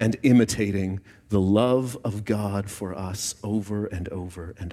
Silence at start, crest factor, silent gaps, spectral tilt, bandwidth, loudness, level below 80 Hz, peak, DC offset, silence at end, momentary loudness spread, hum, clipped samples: 0 s; 18 dB; none; -6 dB/octave; 15.5 kHz; -25 LUFS; -50 dBFS; -8 dBFS; under 0.1%; 0 s; 14 LU; none; under 0.1%